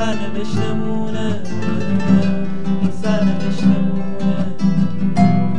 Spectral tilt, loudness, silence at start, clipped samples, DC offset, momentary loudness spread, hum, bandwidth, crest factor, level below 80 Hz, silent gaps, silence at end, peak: -7.5 dB/octave; -19 LUFS; 0 s; under 0.1%; 10%; 7 LU; none; 9 kHz; 16 dB; -50 dBFS; none; 0 s; 0 dBFS